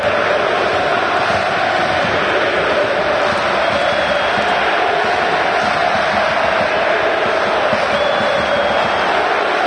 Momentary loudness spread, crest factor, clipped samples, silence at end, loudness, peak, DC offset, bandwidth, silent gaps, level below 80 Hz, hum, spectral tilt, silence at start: 1 LU; 12 dB; under 0.1%; 0 s; -15 LUFS; -2 dBFS; under 0.1%; 11 kHz; none; -44 dBFS; none; -4 dB/octave; 0 s